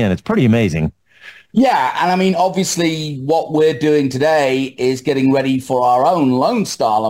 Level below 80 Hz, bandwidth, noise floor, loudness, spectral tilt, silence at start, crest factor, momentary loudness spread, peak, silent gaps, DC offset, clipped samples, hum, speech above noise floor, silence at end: -46 dBFS; 16 kHz; -42 dBFS; -15 LUFS; -5.5 dB/octave; 0 s; 10 dB; 5 LU; -4 dBFS; none; under 0.1%; under 0.1%; none; 27 dB; 0 s